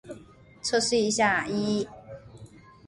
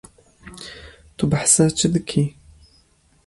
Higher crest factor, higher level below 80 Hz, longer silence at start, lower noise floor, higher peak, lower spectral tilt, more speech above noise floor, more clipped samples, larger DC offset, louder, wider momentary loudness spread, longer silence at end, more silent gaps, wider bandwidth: about the same, 18 dB vs 20 dB; second, -58 dBFS vs -48 dBFS; second, 0.05 s vs 0.45 s; second, -51 dBFS vs -58 dBFS; second, -10 dBFS vs -2 dBFS; second, -3 dB/octave vs -4.5 dB/octave; second, 26 dB vs 40 dB; neither; neither; second, -26 LUFS vs -18 LUFS; about the same, 23 LU vs 22 LU; second, 0.4 s vs 1 s; neither; about the same, 11.5 kHz vs 11.5 kHz